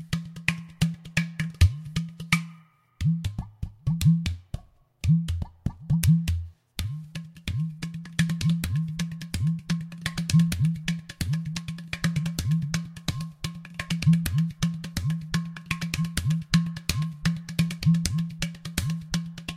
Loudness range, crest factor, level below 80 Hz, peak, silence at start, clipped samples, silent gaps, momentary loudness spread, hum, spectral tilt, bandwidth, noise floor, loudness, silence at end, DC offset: 3 LU; 26 dB; -40 dBFS; -2 dBFS; 0 s; under 0.1%; none; 12 LU; none; -5 dB/octave; 15.5 kHz; -53 dBFS; -28 LUFS; 0 s; under 0.1%